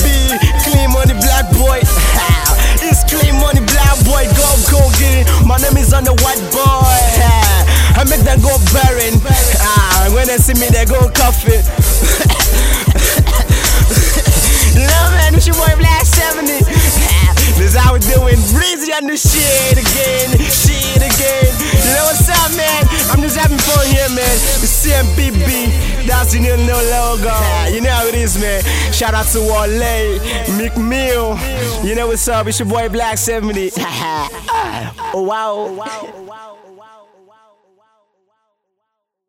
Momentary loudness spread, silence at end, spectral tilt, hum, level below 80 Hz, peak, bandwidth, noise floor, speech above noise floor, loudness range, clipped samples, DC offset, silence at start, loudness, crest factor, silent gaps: 7 LU; 2.75 s; -4 dB/octave; none; -14 dBFS; 0 dBFS; 16.5 kHz; -74 dBFS; 60 dB; 7 LU; under 0.1%; under 0.1%; 0 s; -11 LUFS; 10 dB; none